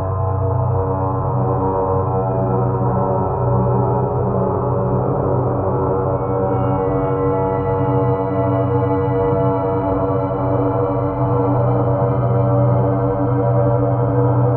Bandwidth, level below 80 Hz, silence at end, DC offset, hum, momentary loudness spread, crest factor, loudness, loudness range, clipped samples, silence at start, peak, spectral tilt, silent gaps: 3.1 kHz; -36 dBFS; 0 s; under 0.1%; none; 3 LU; 12 dB; -18 LUFS; 2 LU; under 0.1%; 0 s; -4 dBFS; -14.5 dB/octave; none